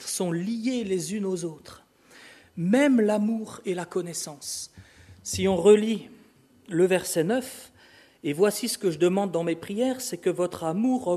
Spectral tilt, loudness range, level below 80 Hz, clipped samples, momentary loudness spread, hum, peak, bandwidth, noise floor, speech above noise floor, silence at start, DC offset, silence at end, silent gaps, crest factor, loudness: -5 dB/octave; 2 LU; -64 dBFS; under 0.1%; 13 LU; none; -6 dBFS; 13.5 kHz; -57 dBFS; 32 dB; 0 s; under 0.1%; 0 s; none; 20 dB; -26 LUFS